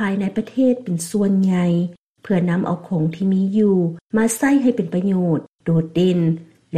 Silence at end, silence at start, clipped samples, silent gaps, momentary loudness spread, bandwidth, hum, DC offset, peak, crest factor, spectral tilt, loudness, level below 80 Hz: 0 s; 0 s; under 0.1%; 1.99-2.15 s, 4.01-4.10 s, 5.49-5.55 s; 6 LU; 15 kHz; none; under 0.1%; -6 dBFS; 12 dB; -7 dB/octave; -19 LUFS; -56 dBFS